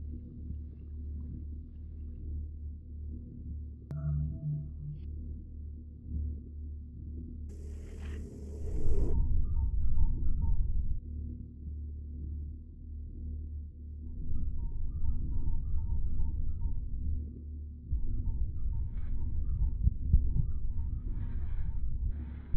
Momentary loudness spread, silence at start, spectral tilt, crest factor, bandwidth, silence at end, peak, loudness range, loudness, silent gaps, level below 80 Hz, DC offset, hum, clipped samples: 11 LU; 0 s; -10.5 dB/octave; 20 dB; 1.9 kHz; 0 s; -12 dBFS; 8 LU; -39 LUFS; none; -34 dBFS; under 0.1%; none; under 0.1%